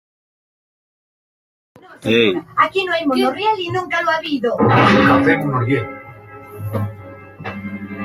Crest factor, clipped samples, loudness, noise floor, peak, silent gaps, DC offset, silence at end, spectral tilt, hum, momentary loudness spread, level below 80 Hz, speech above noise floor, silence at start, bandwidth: 18 dB; under 0.1%; -16 LUFS; -37 dBFS; -2 dBFS; none; under 0.1%; 0 s; -6.5 dB/octave; none; 19 LU; -54 dBFS; 22 dB; 1.9 s; 15.5 kHz